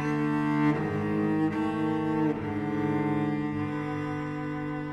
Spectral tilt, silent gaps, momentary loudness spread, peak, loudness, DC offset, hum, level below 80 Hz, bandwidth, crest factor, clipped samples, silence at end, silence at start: -8.5 dB/octave; none; 7 LU; -14 dBFS; -29 LUFS; under 0.1%; none; -56 dBFS; 8.4 kHz; 14 dB; under 0.1%; 0 s; 0 s